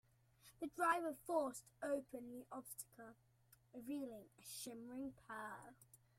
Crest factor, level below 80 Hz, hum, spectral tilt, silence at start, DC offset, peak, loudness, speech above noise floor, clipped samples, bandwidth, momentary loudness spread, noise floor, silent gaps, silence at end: 22 dB; -82 dBFS; none; -3.5 dB/octave; 0.45 s; under 0.1%; -26 dBFS; -46 LUFS; 24 dB; under 0.1%; 16 kHz; 17 LU; -71 dBFS; none; 0.25 s